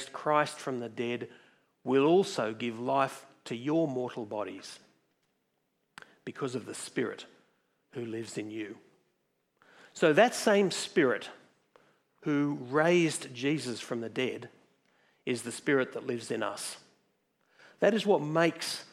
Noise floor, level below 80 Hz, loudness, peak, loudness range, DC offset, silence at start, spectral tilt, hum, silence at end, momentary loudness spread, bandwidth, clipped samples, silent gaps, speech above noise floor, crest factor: -78 dBFS; -88 dBFS; -30 LUFS; -10 dBFS; 11 LU; under 0.1%; 0 s; -4.5 dB/octave; none; 0.1 s; 18 LU; 15 kHz; under 0.1%; none; 48 dB; 22 dB